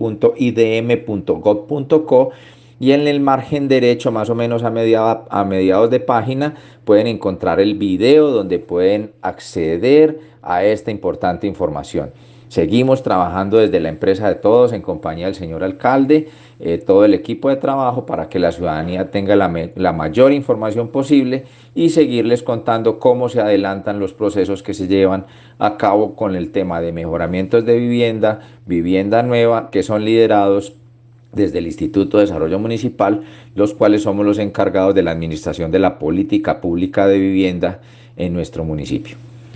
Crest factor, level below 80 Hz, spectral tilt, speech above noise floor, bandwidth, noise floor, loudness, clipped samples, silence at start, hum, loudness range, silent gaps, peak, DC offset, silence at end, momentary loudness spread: 16 dB; -48 dBFS; -7.5 dB/octave; 30 dB; 9 kHz; -45 dBFS; -16 LUFS; under 0.1%; 0 s; none; 2 LU; none; 0 dBFS; under 0.1%; 0 s; 10 LU